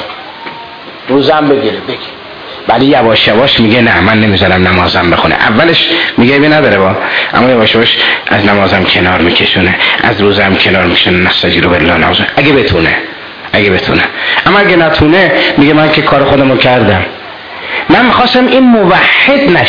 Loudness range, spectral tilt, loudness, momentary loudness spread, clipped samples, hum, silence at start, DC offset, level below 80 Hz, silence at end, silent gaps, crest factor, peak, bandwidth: 2 LU; -7 dB/octave; -6 LUFS; 12 LU; 0.8%; none; 0 s; 0.3%; -32 dBFS; 0 s; none; 8 dB; 0 dBFS; 5.4 kHz